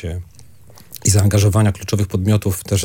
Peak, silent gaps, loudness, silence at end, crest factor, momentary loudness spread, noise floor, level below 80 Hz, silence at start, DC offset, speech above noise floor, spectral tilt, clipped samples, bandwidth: 0 dBFS; none; -17 LUFS; 0 s; 18 dB; 15 LU; -45 dBFS; -44 dBFS; 0 s; under 0.1%; 29 dB; -5.5 dB/octave; under 0.1%; 17 kHz